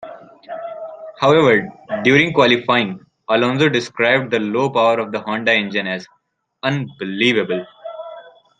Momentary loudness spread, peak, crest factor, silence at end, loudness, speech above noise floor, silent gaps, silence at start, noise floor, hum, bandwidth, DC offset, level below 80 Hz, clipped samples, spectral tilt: 19 LU; 0 dBFS; 18 dB; 0.3 s; -17 LUFS; 23 dB; none; 0 s; -39 dBFS; none; 9.4 kHz; under 0.1%; -58 dBFS; under 0.1%; -5.5 dB/octave